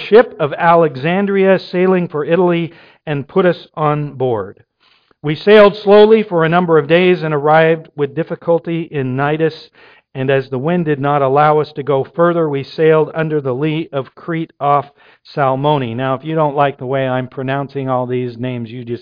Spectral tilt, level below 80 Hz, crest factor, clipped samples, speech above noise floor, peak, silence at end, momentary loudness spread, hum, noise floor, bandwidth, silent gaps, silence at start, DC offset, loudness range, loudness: -9.5 dB/octave; -56 dBFS; 14 dB; under 0.1%; 41 dB; 0 dBFS; 0.05 s; 12 LU; none; -55 dBFS; 5.2 kHz; none; 0 s; under 0.1%; 7 LU; -14 LUFS